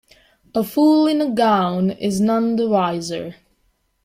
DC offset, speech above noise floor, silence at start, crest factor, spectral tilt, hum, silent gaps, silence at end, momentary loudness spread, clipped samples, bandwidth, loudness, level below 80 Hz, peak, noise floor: under 0.1%; 47 dB; 0.55 s; 14 dB; -6 dB/octave; none; none; 0.7 s; 11 LU; under 0.1%; 16 kHz; -18 LUFS; -58 dBFS; -4 dBFS; -65 dBFS